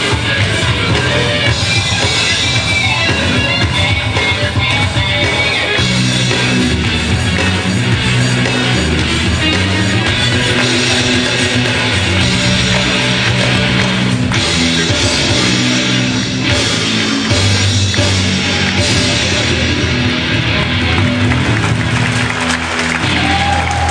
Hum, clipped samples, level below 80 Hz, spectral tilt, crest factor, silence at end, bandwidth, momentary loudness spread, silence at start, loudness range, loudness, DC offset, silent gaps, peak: none; under 0.1%; -28 dBFS; -4 dB/octave; 12 dB; 0 s; 10 kHz; 2 LU; 0 s; 1 LU; -12 LUFS; under 0.1%; none; 0 dBFS